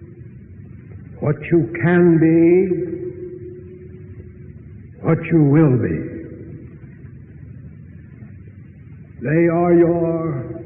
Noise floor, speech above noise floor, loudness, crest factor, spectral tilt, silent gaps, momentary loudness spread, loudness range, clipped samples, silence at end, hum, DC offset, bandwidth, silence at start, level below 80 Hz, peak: -39 dBFS; 24 dB; -17 LUFS; 14 dB; -14 dB/octave; none; 26 LU; 9 LU; under 0.1%; 0 s; none; under 0.1%; 3.5 kHz; 0 s; -48 dBFS; -4 dBFS